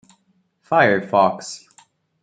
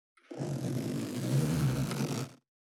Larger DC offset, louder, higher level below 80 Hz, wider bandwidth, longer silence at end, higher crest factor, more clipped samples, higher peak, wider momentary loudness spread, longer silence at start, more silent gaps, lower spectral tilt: neither; first, -17 LUFS vs -33 LUFS; second, -68 dBFS vs -56 dBFS; second, 9.4 kHz vs 17 kHz; first, 0.65 s vs 0.3 s; about the same, 18 dB vs 14 dB; neither; first, -2 dBFS vs -18 dBFS; first, 18 LU vs 10 LU; first, 0.7 s vs 0.3 s; neither; about the same, -5 dB/octave vs -6 dB/octave